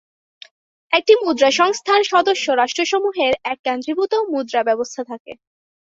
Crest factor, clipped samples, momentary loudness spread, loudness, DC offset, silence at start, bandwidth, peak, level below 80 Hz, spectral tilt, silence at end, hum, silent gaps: 18 dB; under 0.1%; 8 LU; -17 LUFS; under 0.1%; 0.9 s; 7.8 kHz; 0 dBFS; -62 dBFS; -1.5 dB/octave; 0.6 s; none; 3.59-3.64 s, 5.20-5.25 s